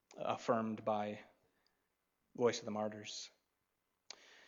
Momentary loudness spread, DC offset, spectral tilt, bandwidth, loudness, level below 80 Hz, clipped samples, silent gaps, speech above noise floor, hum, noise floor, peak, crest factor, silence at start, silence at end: 19 LU; under 0.1%; -4.5 dB/octave; 7.8 kHz; -40 LUFS; -86 dBFS; under 0.1%; none; 46 dB; none; -85 dBFS; -20 dBFS; 22 dB; 0.1 s; 0.05 s